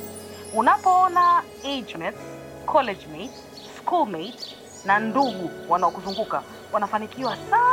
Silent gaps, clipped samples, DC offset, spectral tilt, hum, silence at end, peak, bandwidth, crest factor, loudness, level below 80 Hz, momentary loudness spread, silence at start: none; under 0.1%; under 0.1%; -4 dB/octave; none; 0 s; -6 dBFS; 17 kHz; 18 dB; -23 LUFS; -60 dBFS; 19 LU; 0 s